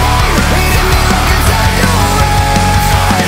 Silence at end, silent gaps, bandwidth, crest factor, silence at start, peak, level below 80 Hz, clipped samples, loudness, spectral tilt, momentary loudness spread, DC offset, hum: 0 s; none; 16.5 kHz; 10 dB; 0 s; 0 dBFS; -14 dBFS; under 0.1%; -10 LUFS; -4 dB/octave; 0 LU; under 0.1%; none